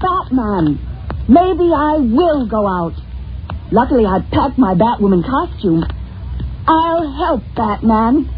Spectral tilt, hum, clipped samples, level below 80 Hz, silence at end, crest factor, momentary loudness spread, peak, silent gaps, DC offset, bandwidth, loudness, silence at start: -6.5 dB/octave; none; under 0.1%; -28 dBFS; 0 s; 14 dB; 13 LU; 0 dBFS; none; under 0.1%; 5 kHz; -14 LUFS; 0 s